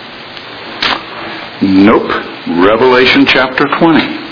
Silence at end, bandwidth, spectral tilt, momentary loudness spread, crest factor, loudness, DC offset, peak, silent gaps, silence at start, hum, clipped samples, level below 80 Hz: 0 s; 5.4 kHz; -6 dB/octave; 18 LU; 10 dB; -9 LUFS; under 0.1%; 0 dBFS; none; 0 s; none; 0.7%; -42 dBFS